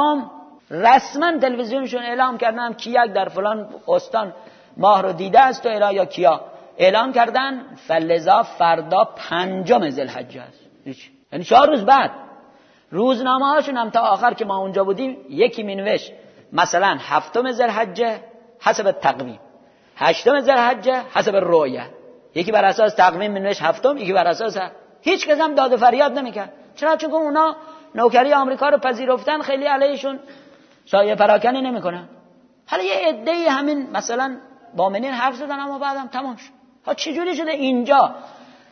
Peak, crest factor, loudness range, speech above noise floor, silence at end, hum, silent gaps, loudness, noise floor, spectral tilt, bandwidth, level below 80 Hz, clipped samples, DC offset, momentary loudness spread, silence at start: 0 dBFS; 18 dB; 4 LU; 34 dB; 0.4 s; none; none; -18 LUFS; -52 dBFS; -4.5 dB/octave; 6.6 kHz; -66 dBFS; under 0.1%; under 0.1%; 14 LU; 0 s